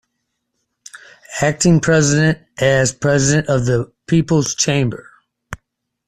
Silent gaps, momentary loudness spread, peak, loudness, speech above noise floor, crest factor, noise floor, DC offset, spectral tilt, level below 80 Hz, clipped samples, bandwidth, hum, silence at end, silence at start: none; 20 LU; -2 dBFS; -16 LUFS; 59 dB; 16 dB; -73 dBFS; under 0.1%; -5 dB/octave; -44 dBFS; under 0.1%; 13 kHz; none; 0.55 s; 0.95 s